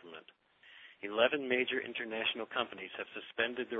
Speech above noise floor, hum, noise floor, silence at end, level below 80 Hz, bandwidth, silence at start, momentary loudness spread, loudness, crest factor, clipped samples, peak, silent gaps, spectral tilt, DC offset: 27 dB; none; -63 dBFS; 0 s; -80 dBFS; 4 kHz; 0 s; 21 LU; -35 LUFS; 24 dB; under 0.1%; -14 dBFS; none; 0 dB/octave; under 0.1%